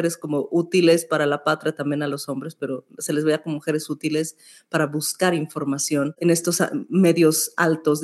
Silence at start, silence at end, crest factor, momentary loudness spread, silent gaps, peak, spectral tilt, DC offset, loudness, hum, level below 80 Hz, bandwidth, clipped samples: 0 s; 0 s; 16 dB; 10 LU; none; -6 dBFS; -4.5 dB/octave; under 0.1%; -22 LUFS; none; -82 dBFS; 13 kHz; under 0.1%